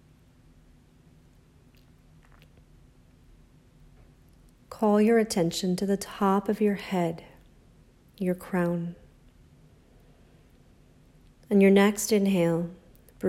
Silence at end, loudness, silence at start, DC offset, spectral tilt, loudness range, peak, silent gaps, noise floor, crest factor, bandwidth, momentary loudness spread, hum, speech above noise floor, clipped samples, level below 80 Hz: 0 s; -25 LUFS; 4.7 s; under 0.1%; -6 dB/octave; 9 LU; -8 dBFS; none; -57 dBFS; 20 dB; 15.5 kHz; 12 LU; none; 33 dB; under 0.1%; -60 dBFS